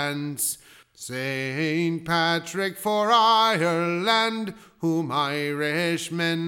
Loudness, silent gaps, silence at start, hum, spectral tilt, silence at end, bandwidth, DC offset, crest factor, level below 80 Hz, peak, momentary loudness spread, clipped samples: -23 LUFS; none; 0 s; none; -4 dB/octave; 0 s; 19 kHz; under 0.1%; 18 dB; -68 dBFS; -8 dBFS; 11 LU; under 0.1%